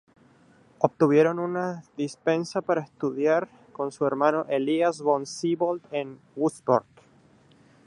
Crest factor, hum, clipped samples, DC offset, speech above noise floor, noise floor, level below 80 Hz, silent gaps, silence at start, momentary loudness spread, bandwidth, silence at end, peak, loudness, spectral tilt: 24 dB; none; under 0.1%; under 0.1%; 33 dB; -58 dBFS; -74 dBFS; none; 0.8 s; 11 LU; 11.5 kHz; 1.05 s; -4 dBFS; -26 LUFS; -6 dB/octave